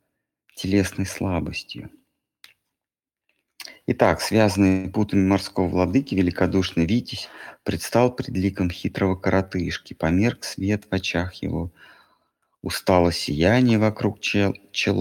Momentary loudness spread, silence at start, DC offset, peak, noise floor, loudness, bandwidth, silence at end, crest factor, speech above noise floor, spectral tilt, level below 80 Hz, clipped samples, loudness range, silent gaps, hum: 13 LU; 0.55 s; under 0.1%; -2 dBFS; -90 dBFS; -22 LUFS; 17.5 kHz; 0 s; 22 dB; 68 dB; -6 dB/octave; -46 dBFS; under 0.1%; 7 LU; none; none